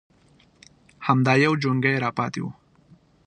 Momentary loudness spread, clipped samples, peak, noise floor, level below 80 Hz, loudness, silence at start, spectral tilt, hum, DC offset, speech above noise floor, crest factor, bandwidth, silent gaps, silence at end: 13 LU; under 0.1%; -4 dBFS; -58 dBFS; -64 dBFS; -22 LUFS; 1 s; -6.5 dB/octave; none; under 0.1%; 36 dB; 20 dB; 9.4 kHz; none; 0.75 s